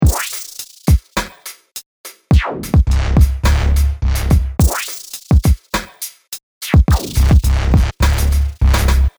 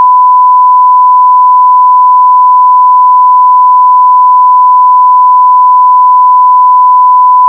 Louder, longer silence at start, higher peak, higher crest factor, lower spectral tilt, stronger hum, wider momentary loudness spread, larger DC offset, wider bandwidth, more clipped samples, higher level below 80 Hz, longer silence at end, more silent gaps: second, -16 LUFS vs -3 LUFS; about the same, 0 s vs 0 s; about the same, -2 dBFS vs 0 dBFS; first, 12 dB vs 4 dB; first, -5.5 dB/octave vs -3 dB/octave; neither; first, 16 LU vs 0 LU; neither; first, over 20 kHz vs 1.1 kHz; second, under 0.1% vs 1%; first, -16 dBFS vs under -90 dBFS; about the same, 0.1 s vs 0 s; first, 1.86-2.04 s, 6.43-6.61 s vs none